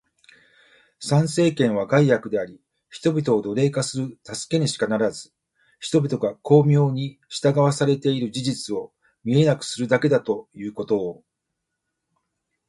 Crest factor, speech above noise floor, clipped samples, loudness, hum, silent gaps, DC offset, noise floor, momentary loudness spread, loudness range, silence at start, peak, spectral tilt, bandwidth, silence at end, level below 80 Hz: 20 dB; 59 dB; under 0.1%; -22 LUFS; none; none; under 0.1%; -80 dBFS; 14 LU; 3 LU; 1 s; -2 dBFS; -6 dB/octave; 11.5 kHz; 1.55 s; -62 dBFS